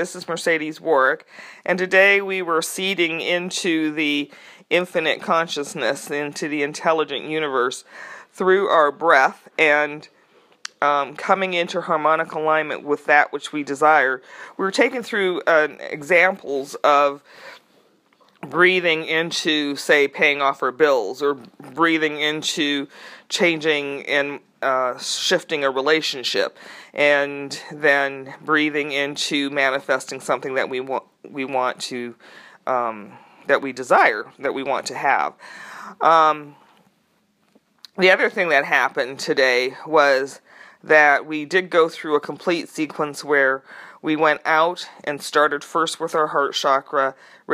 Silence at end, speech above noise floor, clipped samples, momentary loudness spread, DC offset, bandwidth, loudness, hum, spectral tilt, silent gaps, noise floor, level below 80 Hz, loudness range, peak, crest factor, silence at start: 0 s; 44 dB; under 0.1%; 12 LU; under 0.1%; 15.5 kHz; -20 LUFS; none; -3 dB/octave; none; -64 dBFS; -80 dBFS; 4 LU; 0 dBFS; 20 dB; 0 s